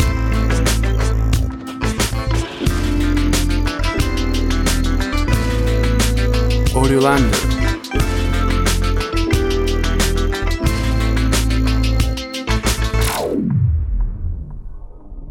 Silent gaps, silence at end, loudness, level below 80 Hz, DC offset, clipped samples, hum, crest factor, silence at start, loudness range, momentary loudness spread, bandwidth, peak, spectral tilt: none; 0 s; -18 LUFS; -20 dBFS; under 0.1%; under 0.1%; none; 16 dB; 0 s; 2 LU; 5 LU; 16.5 kHz; 0 dBFS; -5 dB/octave